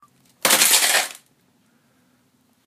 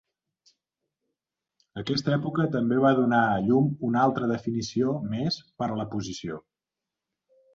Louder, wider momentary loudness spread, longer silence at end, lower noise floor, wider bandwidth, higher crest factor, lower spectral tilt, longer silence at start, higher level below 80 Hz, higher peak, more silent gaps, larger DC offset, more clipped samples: first, -16 LUFS vs -26 LUFS; second, 10 LU vs 13 LU; first, 1.55 s vs 1.15 s; second, -62 dBFS vs -89 dBFS; first, 15.5 kHz vs 7.6 kHz; about the same, 22 dB vs 18 dB; second, 1.5 dB/octave vs -6.5 dB/octave; second, 0.45 s vs 1.75 s; second, -78 dBFS vs -62 dBFS; first, 0 dBFS vs -8 dBFS; neither; neither; neither